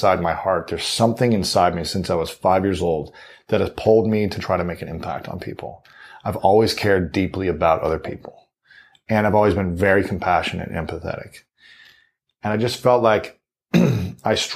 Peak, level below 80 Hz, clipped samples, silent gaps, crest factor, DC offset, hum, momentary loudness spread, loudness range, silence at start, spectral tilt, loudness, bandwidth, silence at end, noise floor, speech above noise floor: -2 dBFS; -46 dBFS; under 0.1%; none; 18 dB; under 0.1%; none; 13 LU; 3 LU; 0 s; -5.5 dB/octave; -20 LUFS; 15.5 kHz; 0 s; -61 dBFS; 41 dB